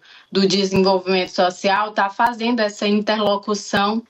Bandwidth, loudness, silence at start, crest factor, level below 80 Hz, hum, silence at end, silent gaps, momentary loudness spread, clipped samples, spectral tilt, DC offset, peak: 15 kHz; -19 LUFS; 0.3 s; 14 dB; -56 dBFS; none; 0.1 s; none; 4 LU; under 0.1%; -4.5 dB/octave; under 0.1%; -6 dBFS